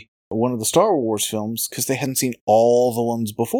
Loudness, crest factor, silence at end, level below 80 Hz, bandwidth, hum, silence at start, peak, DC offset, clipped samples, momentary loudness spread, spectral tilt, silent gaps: -20 LUFS; 16 dB; 0 s; -62 dBFS; 19 kHz; none; 0.3 s; -4 dBFS; under 0.1%; under 0.1%; 8 LU; -4.5 dB/octave; 2.41-2.47 s